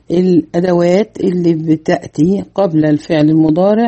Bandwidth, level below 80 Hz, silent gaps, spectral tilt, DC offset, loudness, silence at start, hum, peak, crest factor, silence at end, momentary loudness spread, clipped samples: 8.4 kHz; -48 dBFS; none; -8 dB/octave; under 0.1%; -13 LUFS; 0.1 s; none; 0 dBFS; 12 dB; 0 s; 4 LU; under 0.1%